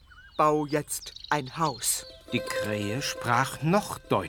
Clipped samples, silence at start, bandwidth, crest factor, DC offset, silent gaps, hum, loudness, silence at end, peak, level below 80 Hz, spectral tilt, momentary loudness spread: under 0.1%; 0.1 s; 19.5 kHz; 20 dB; under 0.1%; none; none; -28 LUFS; 0 s; -8 dBFS; -56 dBFS; -4 dB/octave; 8 LU